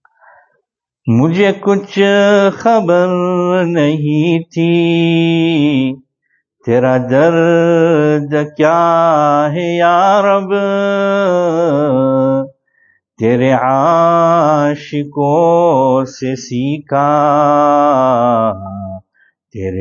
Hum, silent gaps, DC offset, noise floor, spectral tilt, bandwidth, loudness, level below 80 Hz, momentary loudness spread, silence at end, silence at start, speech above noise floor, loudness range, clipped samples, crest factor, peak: none; none; under 0.1%; -68 dBFS; -7 dB/octave; 7.4 kHz; -12 LUFS; -58 dBFS; 8 LU; 0 s; 1.05 s; 56 dB; 2 LU; under 0.1%; 12 dB; 0 dBFS